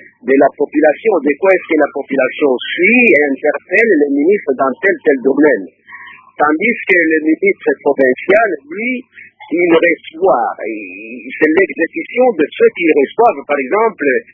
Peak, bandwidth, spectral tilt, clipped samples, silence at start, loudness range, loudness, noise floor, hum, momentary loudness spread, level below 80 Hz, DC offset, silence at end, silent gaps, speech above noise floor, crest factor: 0 dBFS; 3.8 kHz; -7.5 dB/octave; under 0.1%; 0.25 s; 3 LU; -12 LUFS; -35 dBFS; none; 9 LU; -60 dBFS; under 0.1%; 0.1 s; none; 23 dB; 12 dB